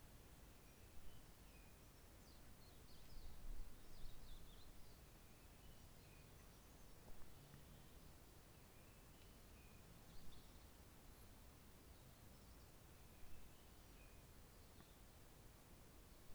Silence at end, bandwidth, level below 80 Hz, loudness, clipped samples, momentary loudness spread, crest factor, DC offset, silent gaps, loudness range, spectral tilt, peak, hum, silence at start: 0 s; over 20 kHz; -64 dBFS; -65 LUFS; under 0.1%; 2 LU; 18 dB; under 0.1%; none; 2 LU; -4 dB/octave; -40 dBFS; none; 0 s